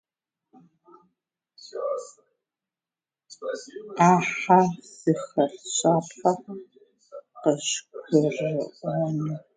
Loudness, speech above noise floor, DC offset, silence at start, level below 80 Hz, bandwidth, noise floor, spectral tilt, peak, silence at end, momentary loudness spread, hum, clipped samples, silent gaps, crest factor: -25 LUFS; over 66 dB; under 0.1%; 1.65 s; -74 dBFS; 9.6 kHz; under -90 dBFS; -5 dB/octave; -4 dBFS; 0.15 s; 19 LU; none; under 0.1%; none; 22 dB